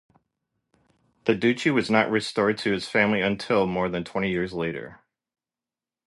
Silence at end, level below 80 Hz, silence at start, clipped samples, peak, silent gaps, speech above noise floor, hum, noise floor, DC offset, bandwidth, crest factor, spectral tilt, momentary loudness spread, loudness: 1.15 s; -58 dBFS; 1.25 s; under 0.1%; -4 dBFS; none; over 66 dB; none; under -90 dBFS; under 0.1%; 11.5 kHz; 22 dB; -5.5 dB/octave; 8 LU; -24 LUFS